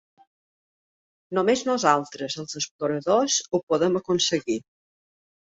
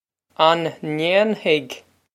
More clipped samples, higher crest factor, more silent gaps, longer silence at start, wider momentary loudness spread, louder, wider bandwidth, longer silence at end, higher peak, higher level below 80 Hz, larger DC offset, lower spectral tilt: neither; about the same, 22 dB vs 20 dB; first, 2.71-2.79 s, 3.63-3.67 s vs none; first, 1.3 s vs 0.4 s; second, 10 LU vs 13 LU; second, -24 LUFS vs -19 LUFS; second, 8.2 kHz vs 13.5 kHz; first, 0.95 s vs 0.35 s; about the same, -4 dBFS vs -2 dBFS; first, -68 dBFS vs -74 dBFS; neither; second, -3.5 dB/octave vs -5 dB/octave